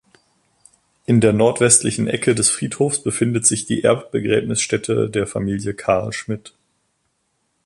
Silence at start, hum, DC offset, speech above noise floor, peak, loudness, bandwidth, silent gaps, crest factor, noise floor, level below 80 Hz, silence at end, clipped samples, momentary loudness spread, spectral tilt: 1.1 s; none; under 0.1%; 51 dB; 0 dBFS; -18 LUFS; 11.5 kHz; none; 20 dB; -69 dBFS; -50 dBFS; 1.15 s; under 0.1%; 10 LU; -4 dB/octave